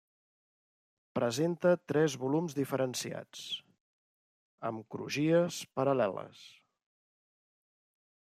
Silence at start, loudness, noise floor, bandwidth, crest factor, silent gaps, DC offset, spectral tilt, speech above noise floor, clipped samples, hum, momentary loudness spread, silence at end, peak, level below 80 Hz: 1.15 s; -33 LUFS; under -90 dBFS; 15 kHz; 20 dB; 3.80-4.58 s; under 0.1%; -5.5 dB/octave; over 58 dB; under 0.1%; none; 12 LU; 1.9 s; -14 dBFS; -80 dBFS